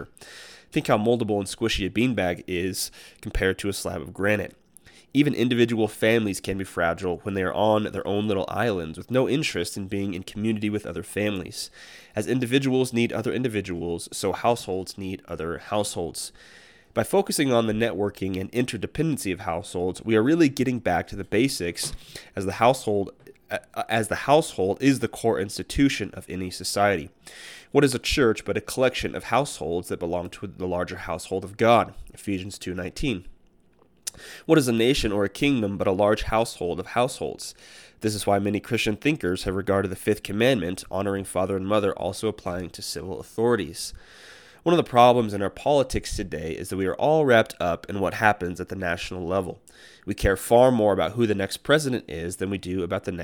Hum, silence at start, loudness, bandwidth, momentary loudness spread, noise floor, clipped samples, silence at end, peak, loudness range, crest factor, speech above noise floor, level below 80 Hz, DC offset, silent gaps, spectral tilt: none; 0 s; -25 LUFS; 19 kHz; 12 LU; -61 dBFS; under 0.1%; 0 s; -2 dBFS; 4 LU; 22 dB; 36 dB; -46 dBFS; under 0.1%; none; -5 dB/octave